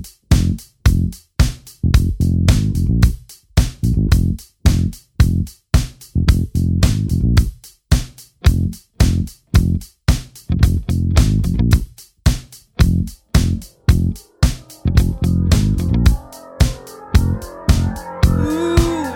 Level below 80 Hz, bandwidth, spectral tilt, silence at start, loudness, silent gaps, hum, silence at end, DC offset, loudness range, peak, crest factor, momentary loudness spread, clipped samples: -20 dBFS; 17 kHz; -6 dB/octave; 0 s; -18 LUFS; none; none; 0 s; under 0.1%; 1 LU; 0 dBFS; 16 dB; 7 LU; under 0.1%